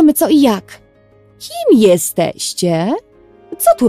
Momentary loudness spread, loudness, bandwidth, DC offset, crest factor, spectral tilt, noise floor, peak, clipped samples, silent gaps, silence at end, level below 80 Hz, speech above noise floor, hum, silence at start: 15 LU; -13 LUFS; 15.5 kHz; under 0.1%; 14 dB; -5 dB/octave; -48 dBFS; 0 dBFS; under 0.1%; none; 0 s; -52 dBFS; 35 dB; none; 0 s